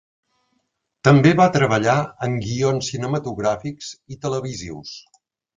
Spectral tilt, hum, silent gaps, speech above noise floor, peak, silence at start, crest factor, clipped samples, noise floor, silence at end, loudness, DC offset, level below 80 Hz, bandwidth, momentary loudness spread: -6 dB/octave; none; none; 53 dB; 0 dBFS; 1.05 s; 20 dB; under 0.1%; -72 dBFS; 0.6 s; -19 LUFS; under 0.1%; -52 dBFS; 9.2 kHz; 20 LU